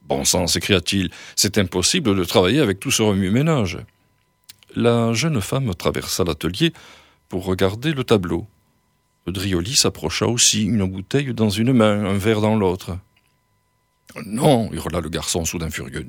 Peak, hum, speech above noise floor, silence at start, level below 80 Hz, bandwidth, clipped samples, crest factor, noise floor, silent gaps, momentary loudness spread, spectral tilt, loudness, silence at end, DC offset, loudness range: 0 dBFS; none; 46 dB; 0.1 s; -44 dBFS; 18 kHz; under 0.1%; 20 dB; -66 dBFS; none; 11 LU; -4 dB/octave; -19 LUFS; 0 s; under 0.1%; 5 LU